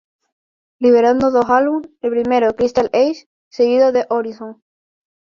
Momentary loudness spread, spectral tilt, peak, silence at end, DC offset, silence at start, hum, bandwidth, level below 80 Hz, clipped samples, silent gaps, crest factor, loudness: 15 LU; -5.5 dB/octave; -2 dBFS; 0.7 s; under 0.1%; 0.8 s; none; 7 kHz; -54 dBFS; under 0.1%; 3.26-3.51 s; 14 dB; -15 LUFS